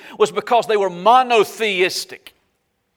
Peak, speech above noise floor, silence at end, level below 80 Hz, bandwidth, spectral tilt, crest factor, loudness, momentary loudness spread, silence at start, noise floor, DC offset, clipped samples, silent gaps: -2 dBFS; 52 dB; 0.8 s; -70 dBFS; 19.5 kHz; -3 dB/octave; 16 dB; -17 LUFS; 6 LU; 0.05 s; -69 dBFS; under 0.1%; under 0.1%; none